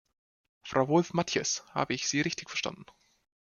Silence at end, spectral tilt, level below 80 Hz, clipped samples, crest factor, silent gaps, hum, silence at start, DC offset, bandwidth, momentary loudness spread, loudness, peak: 0.75 s; -3.5 dB/octave; -68 dBFS; under 0.1%; 22 dB; none; none; 0.65 s; under 0.1%; 10 kHz; 10 LU; -30 LUFS; -10 dBFS